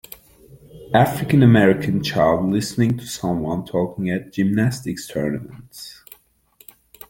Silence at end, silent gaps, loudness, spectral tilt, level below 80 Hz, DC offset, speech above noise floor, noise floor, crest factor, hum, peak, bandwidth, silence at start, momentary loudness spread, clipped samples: 1.2 s; none; -19 LUFS; -6.5 dB/octave; -50 dBFS; under 0.1%; 36 dB; -55 dBFS; 18 dB; none; -2 dBFS; 17 kHz; 0.75 s; 20 LU; under 0.1%